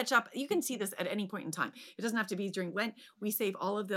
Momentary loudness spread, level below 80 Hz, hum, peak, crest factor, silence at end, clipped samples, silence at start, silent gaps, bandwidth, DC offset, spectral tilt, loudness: 6 LU; -86 dBFS; none; -14 dBFS; 20 dB; 0 s; under 0.1%; 0 s; none; 17 kHz; under 0.1%; -4 dB/octave; -35 LUFS